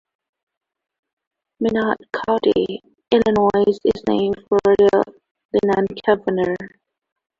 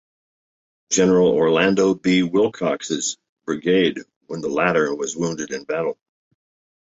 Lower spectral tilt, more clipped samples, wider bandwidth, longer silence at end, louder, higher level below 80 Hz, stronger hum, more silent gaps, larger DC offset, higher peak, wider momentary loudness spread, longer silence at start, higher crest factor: first, -7 dB/octave vs -4.5 dB/octave; neither; about the same, 7.4 kHz vs 8 kHz; second, 0.7 s vs 0.9 s; about the same, -19 LUFS vs -20 LUFS; first, -52 dBFS vs -58 dBFS; neither; about the same, 5.31-5.35 s, 5.45-5.49 s vs 3.29-3.36 s, 4.16-4.21 s; neither; about the same, -2 dBFS vs -4 dBFS; second, 9 LU vs 12 LU; first, 1.6 s vs 0.9 s; about the same, 18 dB vs 18 dB